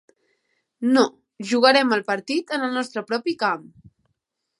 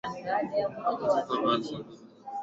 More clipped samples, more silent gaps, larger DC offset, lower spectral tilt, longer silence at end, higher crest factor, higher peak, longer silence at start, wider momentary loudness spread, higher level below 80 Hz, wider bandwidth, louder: neither; neither; neither; second, -3.5 dB/octave vs -5.5 dB/octave; first, 1 s vs 0 s; first, 22 dB vs 16 dB; first, -2 dBFS vs -14 dBFS; first, 0.8 s vs 0.05 s; second, 11 LU vs 14 LU; about the same, -72 dBFS vs -68 dBFS; first, 11.5 kHz vs 8 kHz; first, -21 LUFS vs -29 LUFS